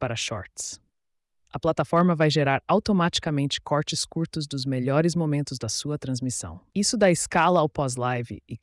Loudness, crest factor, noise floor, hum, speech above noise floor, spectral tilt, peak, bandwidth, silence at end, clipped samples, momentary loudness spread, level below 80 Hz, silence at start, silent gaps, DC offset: -25 LUFS; 16 dB; -76 dBFS; none; 51 dB; -5 dB/octave; -8 dBFS; 12 kHz; 0.05 s; under 0.1%; 12 LU; -56 dBFS; 0 s; none; under 0.1%